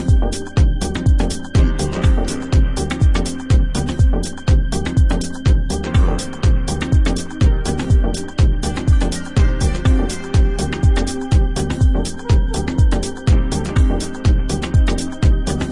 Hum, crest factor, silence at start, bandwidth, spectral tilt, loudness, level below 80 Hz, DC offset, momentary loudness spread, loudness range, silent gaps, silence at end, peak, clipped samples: none; 12 dB; 0 s; 11.5 kHz; -6 dB/octave; -18 LUFS; -18 dBFS; under 0.1%; 3 LU; 0 LU; none; 0 s; -2 dBFS; under 0.1%